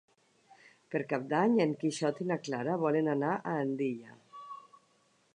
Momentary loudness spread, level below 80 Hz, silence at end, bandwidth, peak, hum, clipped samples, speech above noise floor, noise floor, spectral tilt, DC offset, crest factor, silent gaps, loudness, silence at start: 20 LU; -84 dBFS; 0.75 s; 10 kHz; -14 dBFS; none; under 0.1%; 39 dB; -70 dBFS; -6.5 dB/octave; under 0.1%; 20 dB; none; -32 LUFS; 0.9 s